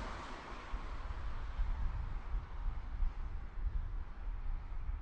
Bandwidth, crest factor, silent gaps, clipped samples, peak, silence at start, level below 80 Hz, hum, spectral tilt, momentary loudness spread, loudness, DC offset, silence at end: 7.2 kHz; 14 dB; none; under 0.1%; -24 dBFS; 0 s; -40 dBFS; none; -6.5 dB/octave; 5 LU; -45 LUFS; under 0.1%; 0 s